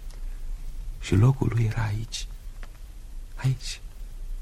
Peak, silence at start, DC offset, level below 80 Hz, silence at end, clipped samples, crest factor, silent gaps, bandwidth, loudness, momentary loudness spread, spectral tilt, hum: -8 dBFS; 0 s; under 0.1%; -36 dBFS; 0 s; under 0.1%; 18 dB; none; 13.5 kHz; -26 LUFS; 24 LU; -6 dB/octave; none